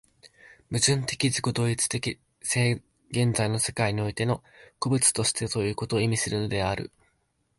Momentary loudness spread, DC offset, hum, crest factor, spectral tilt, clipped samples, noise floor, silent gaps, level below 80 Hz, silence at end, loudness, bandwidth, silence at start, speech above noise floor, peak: 11 LU; under 0.1%; none; 20 dB; -4 dB/octave; under 0.1%; -72 dBFS; none; -52 dBFS; 0.7 s; -26 LUFS; 12 kHz; 0.25 s; 46 dB; -6 dBFS